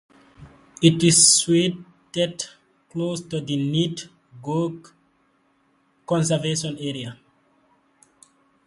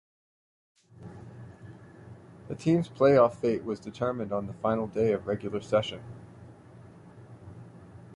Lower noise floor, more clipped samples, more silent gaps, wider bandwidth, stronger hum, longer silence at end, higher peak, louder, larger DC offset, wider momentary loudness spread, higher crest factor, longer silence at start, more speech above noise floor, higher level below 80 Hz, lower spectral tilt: first, -64 dBFS vs -51 dBFS; neither; neither; about the same, 11.5 kHz vs 11 kHz; neither; first, 1.5 s vs 0 s; first, -2 dBFS vs -10 dBFS; first, -20 LUFS vs -28 LUFS; neither; second, 22 LU vs 27 LU; about the same, 24 dB vs 20 dB; second, 0.4 s vs 1 s; first, 43 dB vs 24 dB; about the same, -60 dBFS vs -60 dBFS; second, -3.5 dB/octave vs -7.5 dB/octave